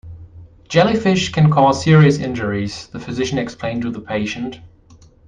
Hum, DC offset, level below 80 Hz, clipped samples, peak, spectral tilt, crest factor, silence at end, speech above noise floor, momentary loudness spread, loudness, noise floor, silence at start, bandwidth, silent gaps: none; under 0.1%; -46 dBFS; under 0.1%; -2 dBFS; -6.5 dB/octave; 16 dB; 0.6 s; 31 dB; 15 LU; -17 LUFS; -47 dBFS; 0.05 s; 9.2 kHz; none